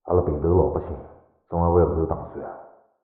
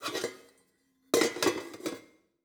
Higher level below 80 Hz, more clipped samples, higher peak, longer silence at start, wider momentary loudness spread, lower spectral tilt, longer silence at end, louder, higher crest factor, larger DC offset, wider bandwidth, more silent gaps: first, -40 dBFS vs -74 dBFS; neither; first, -6 dBFS vs -10 dBFS; about the same, 0.05 s vs 0 s; first, 18 LU vs 12 LU; first, -13.5 dB/octave vs -2.5 dB/octave; about the same, 0.35 s vs 0.45 s; first, -23 LUFS vs -31 LUFS; second, 18 dB vs 24 dB; neither; second, 2.3 kHz vs over 20 kHz; neither